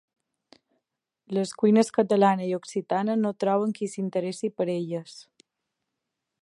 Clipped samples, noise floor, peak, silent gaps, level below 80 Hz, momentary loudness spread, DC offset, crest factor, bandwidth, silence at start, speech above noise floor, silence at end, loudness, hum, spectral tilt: under 0.1%; -84 dBFS; -6 dBFS; none; -78 dBFS; 10 LU; under 0.1%; 20 dB; 11.5 kHz; 1.3 s; 59 dB; 1.2 s; -26 LUFS; none; -6.5 dB/octave